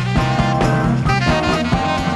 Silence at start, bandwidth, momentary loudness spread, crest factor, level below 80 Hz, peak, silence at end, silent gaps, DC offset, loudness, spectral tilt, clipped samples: 0 s; 12 kHz; 2 LU; 14 dB; -28 dBFS; -2 dBFS; 0 s; none; under 0.1%; -16 LUFS; -6 dB/octave; under 0.1%